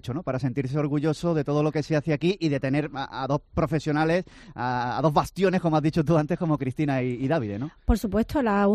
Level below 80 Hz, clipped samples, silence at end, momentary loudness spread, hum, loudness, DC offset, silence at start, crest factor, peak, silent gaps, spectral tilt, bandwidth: -40 dBFS; under 0.1%; 0 s; 5 LU; none; -25 LUFS; under 0.1%; 0.05 s; 16 dB; -8 dBFS; none; -7.5 dB/octave; 14 kHz